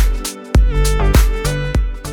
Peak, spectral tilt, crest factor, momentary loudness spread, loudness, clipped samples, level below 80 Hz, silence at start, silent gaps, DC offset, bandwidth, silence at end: 0 dBFS; -5 dB/octave; 12 dB; 6 LU; -17 LUFS; under 0.1%; -14 dBFS; 0 s; none; under 0.1%; 19 kHz; 0 s